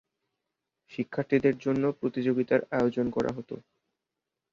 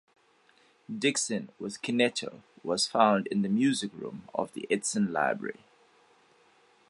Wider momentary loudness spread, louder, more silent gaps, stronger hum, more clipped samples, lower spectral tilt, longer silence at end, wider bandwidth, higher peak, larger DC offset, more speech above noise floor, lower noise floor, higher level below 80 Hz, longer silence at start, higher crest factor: about the same, 14 LU vs 15 LU; about the same, -28 LUFS vs -29 LUFS; neither; neither; neither; first, -8 dB/octave vs -3.5 dB/octave; second, 0.95 s vs 1.4 s; second, 7.4 kHz vs 11.5 kHz; about the same, -10 dBFS vs -8 dBFS; neither; first, 59 dB vs 35 dB; first, -87 dBFS vs -64 dBFS; first, -62 dBFS vs -76 dBFS; about the same, 0.9 s vs 0.9 s; about the same, 20 dB vs 22 dB